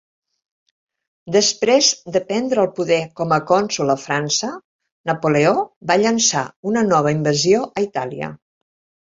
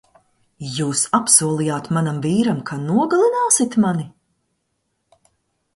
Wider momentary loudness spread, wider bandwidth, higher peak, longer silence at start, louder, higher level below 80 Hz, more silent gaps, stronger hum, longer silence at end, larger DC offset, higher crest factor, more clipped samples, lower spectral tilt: about the same, 10 LU vs 12 LU; second, 8 kHz vs 12 kHz; about the same, -2 dBFS vs 0 dBFS; first, 1.25 s vs 0.6 s; about the same, -18 LUFS vs -18 LUFS; about the same, -60 dBFS vs -60 dBFS; first, 4.64-4.79 s, 4.92-5.04 s, 5.76-5.81 s, 6.56-6.63 s vs none; neither; second, 0.75 s vs 1.65 s; neither; about the same, 18 dB vs 20 dB; neither; about the same, -3.5 dB/octave vs -4.5 dB/octave